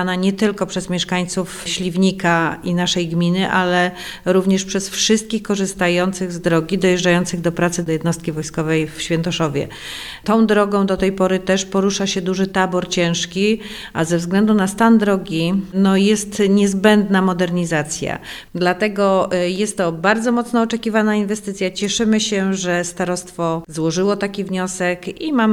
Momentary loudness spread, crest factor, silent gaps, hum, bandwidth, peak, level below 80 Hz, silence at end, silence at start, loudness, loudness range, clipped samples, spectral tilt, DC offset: 8 LU; 18 dB; none; none; 13.5 kHz; 0 dBFS; -48 dBFS; 0 s; 0 s; -18 LUFS; 3 LU; under 0.1%; -5 dB/octave; under 0.1%